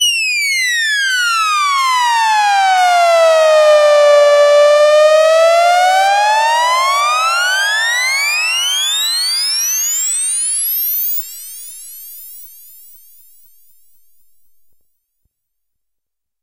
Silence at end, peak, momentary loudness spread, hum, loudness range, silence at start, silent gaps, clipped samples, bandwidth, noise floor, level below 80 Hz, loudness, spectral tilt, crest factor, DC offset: 3.95 s; -2 dBFS; 8 LU; none; 9 LU; 0 s; none; under 0.1%; 16 kHz; -82 dBFS; -72 dBFS; -11 LUFS; 6 dB/octave; 12 dB; under 0.1%